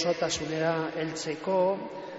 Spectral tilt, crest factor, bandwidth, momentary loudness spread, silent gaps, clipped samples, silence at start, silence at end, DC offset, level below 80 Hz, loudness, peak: -3.5 dB/octave; 14 dB; 8 kHz; 6 LU; none; under 0.1%; 0 s; 0 s; under 0.1%; -62 dBFS; -29 LUFS; -14 dBFS